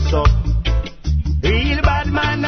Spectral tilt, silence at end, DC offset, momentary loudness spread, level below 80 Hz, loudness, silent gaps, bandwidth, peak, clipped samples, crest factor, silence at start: -6.5 dB/octave; 0 s; under 0.1%; 6 LU; -18 dBFS; -18 LUFS; none; 6.4 kHz; -2 dBFS; under 0.1%; 14 dB; 0 s